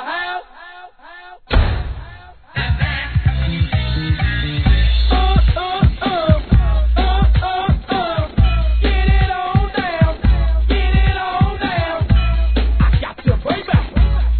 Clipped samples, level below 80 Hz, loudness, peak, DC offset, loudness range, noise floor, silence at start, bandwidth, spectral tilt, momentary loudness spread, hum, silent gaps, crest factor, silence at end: under 0.1%; -18 dBFS; -17 LUFS; 0 dBFS; 0.3%; 4 LU; -39 dBFS; 0 s; 4.5 kHz; -10 dB/octave; 6 LU; none; none; 14 dB; 0 s